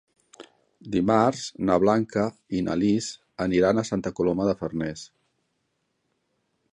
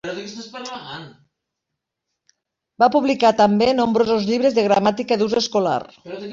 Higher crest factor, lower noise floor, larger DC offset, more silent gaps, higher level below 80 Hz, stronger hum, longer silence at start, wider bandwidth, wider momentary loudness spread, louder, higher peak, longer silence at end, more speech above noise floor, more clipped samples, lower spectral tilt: about the same, 20 dB vs 18 dB; second, -75 dBFS vs -81 dBFS; neither; neither; about the same, -54 dBFS vs -58 dBFS; neither; first, 0.4 s vs 0.05 s; first, 10.5 kHz vs 7.6 kHz; second, 9 LU vs 17 LU; second, -25 LUFS vs -18 LUFS; second, -6 dBFS vs -2 dBFS; first, 1.65 s vs 0 s; second, 51 dB vs 63 dB; neither; about the same, -6 dB/octave vs -5 dB/octave